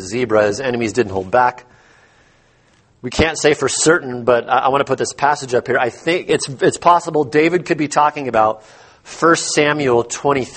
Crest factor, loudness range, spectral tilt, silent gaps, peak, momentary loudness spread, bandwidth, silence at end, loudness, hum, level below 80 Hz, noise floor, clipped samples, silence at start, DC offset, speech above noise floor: 16 dB; 3 LU; -4 dB/octave; none; 0 dBFS; 5 LU; 8.8 kHz; 0 s; -16 LUFS; none; -44 dBFS; -54 dBFS; under 0.1%; 0 s; under 0.1%; 38 dB